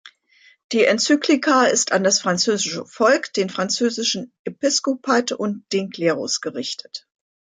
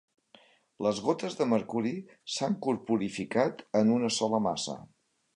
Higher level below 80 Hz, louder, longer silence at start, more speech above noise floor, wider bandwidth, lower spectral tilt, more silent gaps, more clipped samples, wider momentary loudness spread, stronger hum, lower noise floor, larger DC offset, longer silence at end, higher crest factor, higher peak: about the same, -72 dBFS vs -70 dBFS; first, -20 LUFS vs -30 LUFS; second, 0.05 s vs 0.8 s; about the same, 35 dB vs 32 dB; about the same, 10 kHz vs 11 kHz; second, -2.5 dB/octave vs -5 dB/octave; first, 0.64-0.69 s, 4.39-4.45 s vs none; neither; first, 11 LU vs 8 LU; neither; second, -55 dBFS vs -61 dBFS; neither; about the same, 0.6 s vs 0.5 s; about the same, 16 dB vs 18 dB; first, -4 dBFS vs -12 dBFS